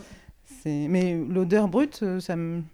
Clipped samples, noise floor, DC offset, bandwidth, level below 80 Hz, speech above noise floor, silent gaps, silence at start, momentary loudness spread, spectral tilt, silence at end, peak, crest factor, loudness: under 0.1%; -49 dBFS; under 0.1%; 13.5 kHz; -56 dBFS; 25 dB; none; 0 s; 8 LU; -7.5 dB/octave; 0.05 s; -10 dBFS; 16 dB; -25 LUFS